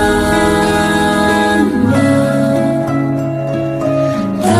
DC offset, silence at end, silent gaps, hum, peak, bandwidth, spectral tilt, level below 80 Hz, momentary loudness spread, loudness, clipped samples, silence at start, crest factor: under 0.1%; 0 s; none; none; 0 dBFS; 14.5 kHz; -6 dB/octave; -34 dBFS; 5 LU; -13 LUFS; under 0.1%; 0 s; 12 dB